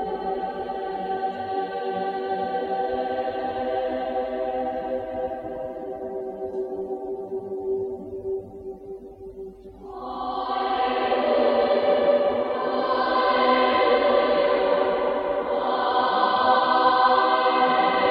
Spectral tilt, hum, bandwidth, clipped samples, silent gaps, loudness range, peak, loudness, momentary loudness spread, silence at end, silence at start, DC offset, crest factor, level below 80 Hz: -6.5 dB/octave; none; 5.4 kHz; under 0.1%; none; 11 LU; -8 dBFS; -24 LUFS; 14 LU; 0 s; 0 s; under 0.1%; 16 dB; -56 dBFS